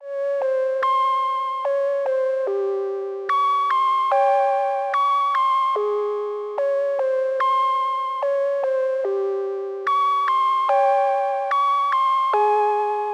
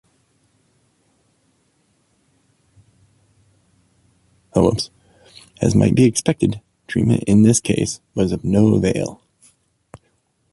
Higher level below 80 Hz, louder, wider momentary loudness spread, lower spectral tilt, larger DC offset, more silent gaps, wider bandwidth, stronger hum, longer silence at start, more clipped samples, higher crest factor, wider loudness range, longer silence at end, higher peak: second, under -90 dBFS vs -44 dBFS; second, -21 LUFS vs -18 LUFS; second, 6 LU vs 11 LU; second, -1.5 dB/octave vs -6 dB/octave; neither; neither; second, 10 kHz vs 11.5 kHz; neither; second, 0 s vs 4.55 s; neither; second, 12 dB vs 20 dB; second, 3 LU vs 9 LU; second, 0 s vs 1.4 s; second, -10 dBFS vs 0 dBFS